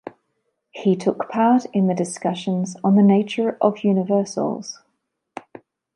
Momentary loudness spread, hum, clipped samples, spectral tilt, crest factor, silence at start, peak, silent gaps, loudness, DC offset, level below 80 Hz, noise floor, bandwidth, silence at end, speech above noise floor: 23 LU; none; under 0.1%; -7 dB/octave; 18 dB; 0.05 s; -4 dBFS; none; -20 LUFS; under 0.1%; -72 dBFS; -74 dBFS; 11 kHz; 0.55 s; 54 dB